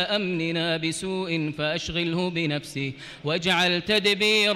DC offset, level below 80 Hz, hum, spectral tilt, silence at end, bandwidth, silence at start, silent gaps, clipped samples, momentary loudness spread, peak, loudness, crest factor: under 0.1%; -54 dBFS; none; -4 dB/octave; 0 s; 16 kHz; 0 s; none; under 0.1%; 9 LU; -12 dBFS; -24 LUFS; 14 dB